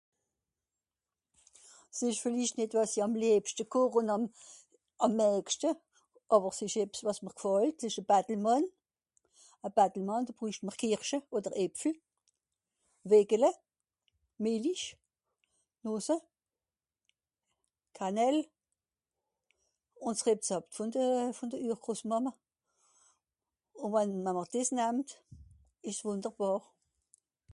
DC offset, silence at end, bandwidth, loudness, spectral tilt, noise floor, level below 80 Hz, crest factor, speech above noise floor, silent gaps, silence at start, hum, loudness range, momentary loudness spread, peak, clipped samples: under 0.1%; 0.95 s; 11.5 kHz; -32 LUFS; -4.5 dB/octave; under -90 dBFS; -76 dBFS; 22 dB; over 58 dB; none; 1.95 s; none; 7 LU; 10 LU; -12 dBFS; under 0.1%